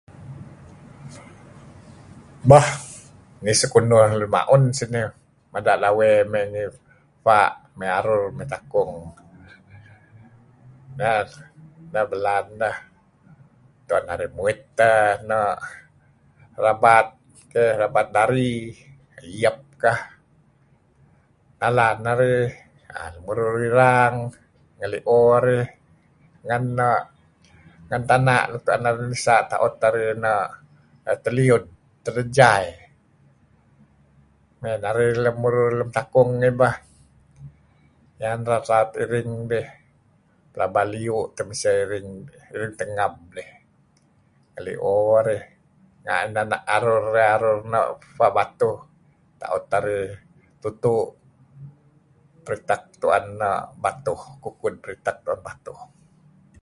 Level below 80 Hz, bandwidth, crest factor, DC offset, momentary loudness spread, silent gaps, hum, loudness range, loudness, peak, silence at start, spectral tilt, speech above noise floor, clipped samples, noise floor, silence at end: -54 dBFS; 11.5 kHz; 22 dB; under 0.1%; 18 LU; none; none; 8 LU; -21 LUFS; 0 dBFS; 0.2 s; -5.5 dB/octave; 39 dB; under 0.1%; -60 dBFS; 0.75 s